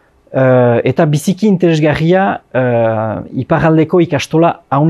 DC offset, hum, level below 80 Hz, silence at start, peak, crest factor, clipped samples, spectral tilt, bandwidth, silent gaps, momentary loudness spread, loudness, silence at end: under 0.1%; none; -44 dBFS; 0.3 s; 0 dBFS; 12 dB; under 0.1%; -7 dB/octave; 13 kHz; none; 6 LU; -12 LUFS; 0 s